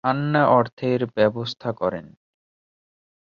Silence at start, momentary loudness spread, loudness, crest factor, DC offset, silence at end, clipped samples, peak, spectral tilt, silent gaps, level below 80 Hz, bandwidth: 0.05 s; 11 LU; -22 LUFS; 18 dB; under 0.1%; 1.2 s; under 0.1%; -4 dBFS; -8 dB/octave; 0.73-0.77 s; -60 dBFS; 7.2 kHz